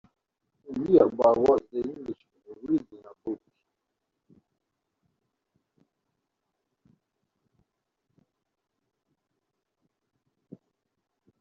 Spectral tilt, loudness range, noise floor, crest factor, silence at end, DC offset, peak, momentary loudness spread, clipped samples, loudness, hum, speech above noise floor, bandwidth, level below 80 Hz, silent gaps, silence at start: -7.5 dB/octave; 20 LU; -82 dBFS; 26 dB; 8.05 s; under 0.1%; -6 dBFS; 20 LU; under 0.1%; -25 LUFS; none; 60 dB; 7.4 kHz; -66 dBFS; none; 0.7 s